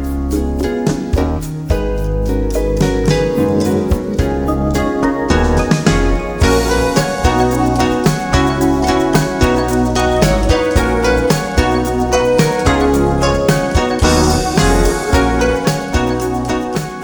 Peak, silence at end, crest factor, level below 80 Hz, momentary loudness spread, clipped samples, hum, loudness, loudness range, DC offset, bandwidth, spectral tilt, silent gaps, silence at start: 0 dBFS; 0 s; 14 dB; -20 dBFS; 5 LU; under 0.1%; none; -14 LUFS; 3 LU; under 0.1%; over 20 kHz; -5.5 dB/octave; none; 0 s